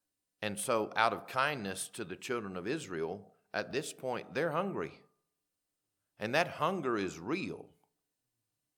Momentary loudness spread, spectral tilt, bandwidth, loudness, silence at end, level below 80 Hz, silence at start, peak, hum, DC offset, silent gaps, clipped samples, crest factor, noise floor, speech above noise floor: 10 LU; -4 dB/octave; 19 kHz; -35 LUFS; 1.1 s; -76 dBFS; 0.4 s; -12 dBFS; none; under 0.1%; none; under 0.1%; 26 dB; -86 dBFS; 51 dB